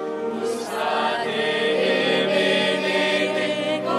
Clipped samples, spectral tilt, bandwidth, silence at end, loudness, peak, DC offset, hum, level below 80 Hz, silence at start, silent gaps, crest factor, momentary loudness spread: under 0.1%; -4 dB/octave; 14 kHz; 0 s; -21 LUFS; -8 dBFS; under 0.1%; none; -74 dBFS; 0 s; none; 14 dB; 7 LU